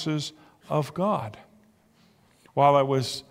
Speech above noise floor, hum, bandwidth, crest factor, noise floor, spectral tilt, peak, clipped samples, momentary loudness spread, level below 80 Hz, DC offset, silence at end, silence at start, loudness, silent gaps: 36 dB; none; 16 kHz; 20 dB; -61 dBFS; -6 dB/octave; -8 dBFS; under 0.1%; 13 LU; -66 dBFS; under 0.1%; 0.1 s; 0 s; -25 LUFS; none